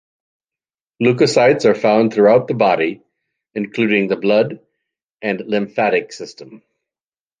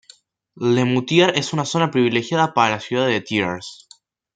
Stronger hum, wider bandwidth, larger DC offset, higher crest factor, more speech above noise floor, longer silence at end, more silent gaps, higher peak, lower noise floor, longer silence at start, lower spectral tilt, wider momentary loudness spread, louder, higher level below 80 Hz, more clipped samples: neither; about the same, 9.6 kHz vs 9.2 kHz; neither; about the same, 16 dB vs 18 dB; first, over 75 dB vs 34 dB; first, 0.85 s vs 0.6 s; first, 5.02-5.08 s vs none; about the same, -2 dBFS vs -2 dBFS; first, under -90 dBFS vs -53 dBFS; first, 1 s vs 0.6 s; about the same, -6 dB/octave vs -5 dB/octave; first, 14 LU vs 8 LU; first, -16 LUFS vs -19 LUFS; about the same, -64 dBFS vs -62 dBFS; neither